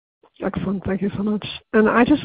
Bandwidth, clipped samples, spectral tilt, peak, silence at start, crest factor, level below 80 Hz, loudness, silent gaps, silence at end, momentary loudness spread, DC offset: 4.9 kHz; under 0.1%; -11 dB/octave; -2 dBFS; 0.4 s; 18 dB; -46 dBFS; -21 LUFS; none; 0 s; 12 LU; under 0.1%